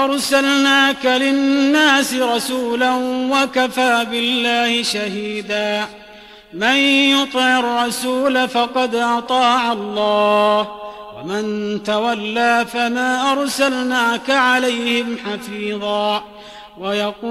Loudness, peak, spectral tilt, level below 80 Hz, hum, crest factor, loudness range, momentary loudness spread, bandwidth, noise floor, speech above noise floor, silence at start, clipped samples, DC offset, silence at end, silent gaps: -16 LUFS; -2 dBFS; -2.5 dB/octave; -58 dBFS; none; 14 dB; 3 LU; 11 LU; 15 kHz; -41 dBFS; 24 dB; 0 s; under 0.1%; under 0.1%; 0 s; none